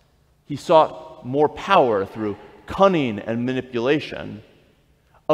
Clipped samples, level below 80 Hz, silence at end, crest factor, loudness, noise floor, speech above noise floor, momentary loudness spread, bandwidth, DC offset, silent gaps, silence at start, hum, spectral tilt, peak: under 0.1%; -54 dBFS; 0 s; 22 dB; -20 LUFS; -58 dBFS; 38 dB; 17 LU; 12 kHz; under 0.1%; none; 0.5 s; none; -6.5 dB/octave; 0 dBFS